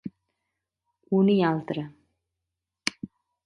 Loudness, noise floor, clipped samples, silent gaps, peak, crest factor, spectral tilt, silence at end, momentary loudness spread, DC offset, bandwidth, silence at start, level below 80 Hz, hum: -26 LUFS; -86 dBFS; under 0.1%; none; -4 dBFS; 26 dB; -6 dB/octave; 0.4 s; 21 LU; under 0.1%; 11.5 kHz; 0.05 s; -70 dBFS; none